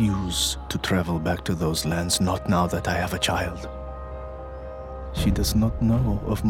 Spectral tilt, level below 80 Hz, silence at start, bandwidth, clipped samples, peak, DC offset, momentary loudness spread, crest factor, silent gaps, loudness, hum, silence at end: -4.5 dB/octave; -34 dBFS; 0 s; 17 kHz; under 0.1%; -10 dBFS; under 0.1%; 14 LU; 16 dB; none; -24 LUFS; none; 0 s